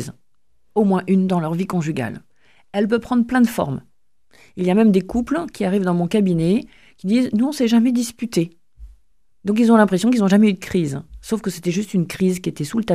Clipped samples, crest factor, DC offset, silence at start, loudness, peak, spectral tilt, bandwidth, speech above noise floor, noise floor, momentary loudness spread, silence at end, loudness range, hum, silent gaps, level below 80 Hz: under 0.1%; 20 dB; 0.2%; 0 s; -19 LUFS; 0 dBFS; -6.5 dB/octave; 15.5 kHz; 53 dB; -71 dBFS; 12 LU; 0 s; 3 LU; none; none; -50 dBFS